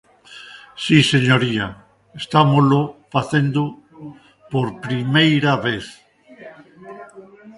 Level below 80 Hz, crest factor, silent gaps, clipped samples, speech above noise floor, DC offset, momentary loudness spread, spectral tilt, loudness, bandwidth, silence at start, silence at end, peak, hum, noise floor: -54 dBFS; 20 dB; none; under 0.1%; 25 dB; under 0.1%; 25 LU; -6 dB/octave; -18 LUFS; 11.5 kHz; 0.3 s; 0.05 s; 0 dBFS; none; -42 dBFS